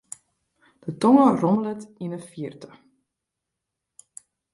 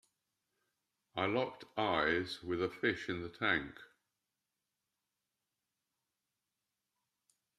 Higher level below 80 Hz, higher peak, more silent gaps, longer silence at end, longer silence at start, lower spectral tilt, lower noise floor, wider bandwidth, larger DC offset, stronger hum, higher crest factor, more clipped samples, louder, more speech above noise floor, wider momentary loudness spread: about the same, -68 dBFS vs -70 dBFS; first, -4 dBFS vs -16 dBFS; neither; second, 1.9 s vs 3.75 s; second, 0.85 s vs 1.15 s; first, -7 dB/octave vs -5.5 dB/octave; second, -84 dBFS vs -89 dBFS; second, 11.5 kHz vs 13 kHz; neither; neither; about the same, 20 dB vs 24 dB; neither; first, -21 LUFS vs -36 LUFS; first, 62 dB vs 53 dB; first, 21 LU vs 8 LU